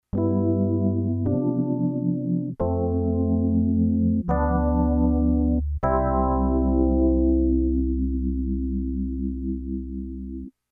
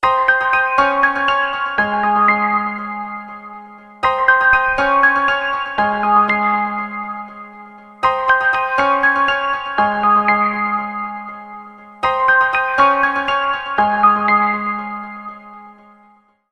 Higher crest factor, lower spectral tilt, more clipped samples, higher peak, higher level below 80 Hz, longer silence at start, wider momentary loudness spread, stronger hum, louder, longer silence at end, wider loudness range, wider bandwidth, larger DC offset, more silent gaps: about the same, 14 dB vs 16 dB; first, -14 dB/octave vs -5 dB/octave; neither; second, -8 dBFS vs 0 dBFS; first, -30 dBFS vs -48 dBFS; first, 0.15 s vs 0 s; second, 8 LU vs 17 LU; neither; second, -23 LUFS vs -15 LUFS; second, 0.25 s vs 0.8 s; about the same, 3 LU vs 3 LU; second, 2.2 kHz vs 9.6 kHz; neither; neither